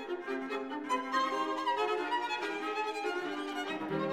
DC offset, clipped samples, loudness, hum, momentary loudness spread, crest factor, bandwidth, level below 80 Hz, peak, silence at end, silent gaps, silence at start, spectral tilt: under 0.1%; under 0.1%; -34 LUFS; none; 6 LU; 16 dB; 15.5 kHz; -76 dBFS; -18 dBFS; 0 s; none; 0 s; -4 dB/octave